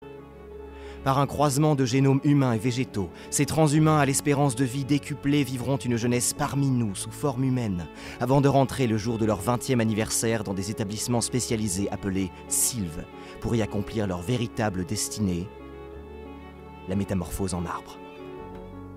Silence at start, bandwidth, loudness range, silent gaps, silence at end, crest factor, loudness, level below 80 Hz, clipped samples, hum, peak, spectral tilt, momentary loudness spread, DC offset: 0 s; 16 kHz; 7 LU; none; 0 s; 18 dB; -25 LUFS; -48 dBFS; under 0.1%; none; -8 dBFS; -5.5 dB/octave; 20 LU; under 0.1%